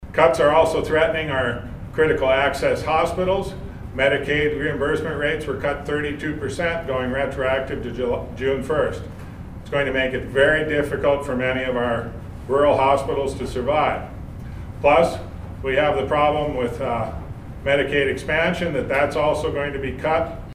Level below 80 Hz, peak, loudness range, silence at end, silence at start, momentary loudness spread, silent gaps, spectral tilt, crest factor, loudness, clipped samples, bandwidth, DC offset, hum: -38 dBFS; -2 dBFS; 4 LU; 0 s; 0 s; 13 LU; none; -6 dB/octave; 20 dB; -21 LUFS; under 0.1%; 15.5 kHz; under 0.1%; none